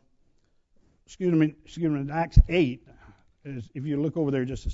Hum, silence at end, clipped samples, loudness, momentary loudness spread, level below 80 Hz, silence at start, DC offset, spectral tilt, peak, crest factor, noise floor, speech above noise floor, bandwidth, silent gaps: none; 0 s; under 0.1%; -26 LUFS; 17 LU; -32 dBFS; 1.1 s; under 0.1%; -8 dB/octave; -4 dBFS; 22 dB; -65 dBFS; 41 dB; 7.8 kHz; none